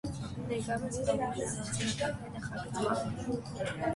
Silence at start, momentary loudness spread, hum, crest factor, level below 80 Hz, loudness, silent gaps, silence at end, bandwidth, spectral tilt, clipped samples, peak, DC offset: 0.05 s; 7 LU; none; 18 dB; -54 dBFS; -35 LUFS; none; 0 s; 11.5 kHz; -5 dB/octave; under 0.1%; -16 dBFS; under 0.1%